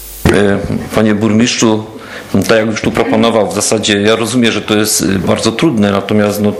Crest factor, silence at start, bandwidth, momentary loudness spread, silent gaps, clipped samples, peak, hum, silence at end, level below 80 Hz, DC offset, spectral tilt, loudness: 12 dB; 0 s; 16.5 kHz; 5 LU; none; 0.2%; 0 dBFS; none; 0 s; -36 dBFS; under 0.1%; -4.5 dB/octave; -11 LUFS